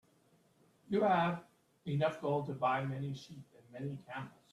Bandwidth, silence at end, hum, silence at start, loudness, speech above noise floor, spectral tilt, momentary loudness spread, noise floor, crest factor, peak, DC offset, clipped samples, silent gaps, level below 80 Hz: 12 kHz; 0.25 s; none; 0.9 s; -36 LUFS; 35 dB; -7.5 dB/octave; 17 LU; -70 dBFS; 18 dB; -18 dBFS; under 0.1%; under 0.1%; none; -76 dBFS